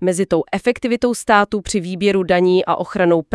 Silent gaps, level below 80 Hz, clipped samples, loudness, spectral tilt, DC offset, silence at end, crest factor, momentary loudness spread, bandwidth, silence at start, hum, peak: none; -46 dBFS; under 0.1%; -17 LUFS; -5 dB/octave; under 0.1%; 0.1 s; 16 dB; 5 LU; 12 kHz; 0 s; none; 0 dBFS